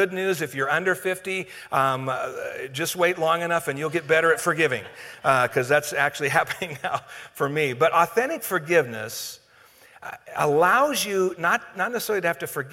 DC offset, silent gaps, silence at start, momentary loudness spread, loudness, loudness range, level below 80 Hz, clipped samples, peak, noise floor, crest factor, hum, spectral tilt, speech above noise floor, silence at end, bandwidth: under 0.1%; none; 0 s; 11 LU; -23 LUFS; 2 LU; -66 dBFS; under 0.1%; -2 dBFS; -54 dBFS; 22 dB; none; -4 dB/octave; 30 dB; 0 s; 17 kHz